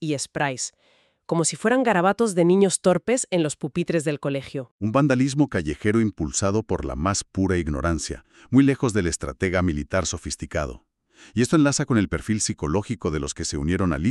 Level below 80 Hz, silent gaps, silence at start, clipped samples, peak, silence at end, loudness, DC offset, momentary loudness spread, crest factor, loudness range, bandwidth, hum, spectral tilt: -40 dBFS; 4.71-4.78 s; 0 s; under 0.1%; -4 dBFS; 0 s; -23 LUFS; under 0.1%; 9 LU; 18 dB; 3 LU; 12 kHz; none; -5 dB/octave